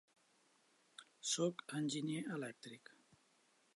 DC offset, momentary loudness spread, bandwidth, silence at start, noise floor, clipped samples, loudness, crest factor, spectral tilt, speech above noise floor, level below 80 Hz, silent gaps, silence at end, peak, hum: under 0.1%; 22 LU; 11.5 kHz; 1 s; -75 dBFS; under 0.1%; -42 LUFS; 20 dB; -4 dB/octave; 33 dB; under -90 dBFS; none; 1 s; -26 dBFS; none